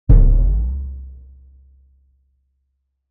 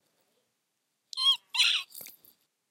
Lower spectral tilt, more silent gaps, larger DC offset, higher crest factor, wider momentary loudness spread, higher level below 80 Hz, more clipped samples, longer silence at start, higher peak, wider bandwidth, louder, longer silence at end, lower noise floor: first, -13.5 dB/octave vs 4.5 dB/octave; neither; neither; about the same, 18 dB vs 20 dB; about the same, 22 LU vs 20 LU; first, -18 dBFS vs under -90 dBFS; neither; second, 0.1 s vs 1.15 s; first, 0 dBFS vs -12 dBFS; second, 1.5 kHz vs 17 kHz; first, -19 LUFS vs -25 LUFS; first, 2 s vs 0.6 s; second, -71 dBFS vs -80 dBFS